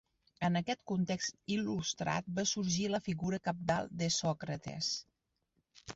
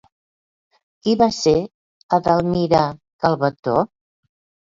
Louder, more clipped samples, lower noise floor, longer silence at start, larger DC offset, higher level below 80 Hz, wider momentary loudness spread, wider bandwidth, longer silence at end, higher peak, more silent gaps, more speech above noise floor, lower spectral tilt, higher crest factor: second, -36 LUFS vs -19 LUFS; neither; second, -81 dBFS vs under -90 dBFS; second, 0.4 s vs 1.05 s; neither; second, -66 dBFS vs -50 dBFS; second, 4 LU vs 8 LU; about the same, 8 kHz vs 7.6 kHz; second, 0 s vs 0.85 s; second, -18 dBFS vs -2 dBFS; second, none vs 1.74-2.09 s, 3.13-3.19 s, 3.59-3.63 s; second, 46 dB vs over 73 dB; second, -4.5 dB/octave vs -6 dB/octave; about the same, 18 dB vs 18 dB